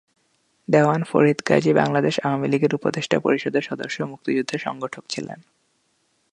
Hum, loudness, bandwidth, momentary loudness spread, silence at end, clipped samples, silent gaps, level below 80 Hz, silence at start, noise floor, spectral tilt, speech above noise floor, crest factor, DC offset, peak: none; -21 LUFS; 11 kHz; 13 LU; 1 s; under 0.1%; none; -66 dBFS; 0.7 s; -67 dBFS; -6 dB/octave; 46 dB; 20 dB; under 0.1%; -2 dBFS